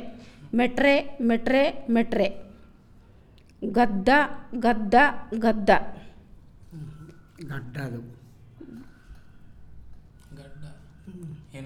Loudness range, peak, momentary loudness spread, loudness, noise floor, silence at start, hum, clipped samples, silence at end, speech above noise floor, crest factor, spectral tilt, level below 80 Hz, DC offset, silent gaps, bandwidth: 18 LU; -6 dBFS; 25 LU; -23 LUFS; -53 dBFS; 0 s; none; under 0.1%; 0 s; 30 dB; 20 dB; -6.5 dB/octave; -48 dBFS; under 0.1%; none; 12.5 kHz